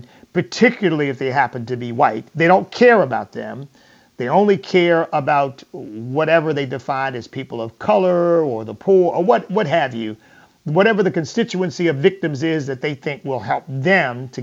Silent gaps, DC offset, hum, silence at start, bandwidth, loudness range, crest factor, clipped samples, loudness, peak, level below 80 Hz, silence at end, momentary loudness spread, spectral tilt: none; under 0.1%; none; 0.35 s; 7.8 kHz; 3 LU; 16 dB; under 0.1%; -18 LUFS; 0 dBFS; -64 dBFS; 0 s; 13 LU; -6.5 dB/octave